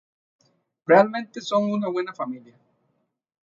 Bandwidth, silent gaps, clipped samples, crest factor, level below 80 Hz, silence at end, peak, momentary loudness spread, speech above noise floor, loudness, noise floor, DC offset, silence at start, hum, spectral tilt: 7.4 kHz; none; under 0.1%; 22 dB; -78 dBFS; 1.05 s; -4 dBFS; 16 LU; 52 dB; -22 LUFS; -74 dBFS; under 0.1%; 0.9 s; none; -6 dB/octave